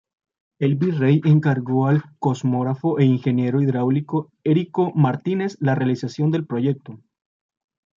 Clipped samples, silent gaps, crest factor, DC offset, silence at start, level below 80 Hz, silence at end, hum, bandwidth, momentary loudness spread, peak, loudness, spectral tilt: under 0.1%; none; 16 dB; under 0.1%; 0.6 s; -66 dBFS; 1 s; none; 7.4 kHz; 6 LU; -4 dBFS; -21 LUFS; -9 dB/octave